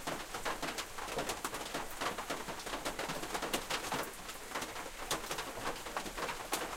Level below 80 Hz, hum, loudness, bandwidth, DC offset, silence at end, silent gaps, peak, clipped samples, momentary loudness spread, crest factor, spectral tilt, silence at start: -56 dBFS; none; -39 LUFS; 16.5 kHz; under 0.1%; 0 s; none; -18 dBFS; under 0.1%; 4 LU; 22 dB; -2 dB/octave; 0 s